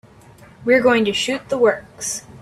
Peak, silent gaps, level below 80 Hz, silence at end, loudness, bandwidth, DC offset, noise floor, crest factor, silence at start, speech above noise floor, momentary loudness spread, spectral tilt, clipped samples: -4 dBFS; none; -56 dBFS; 0.05 s; -18 LUFS; 13.5 kHz; under 0.1%; -45 dBFS; 16 dB; 0.6 s; 27 dB; 11 LU; -3 dB/octave; under 0.1%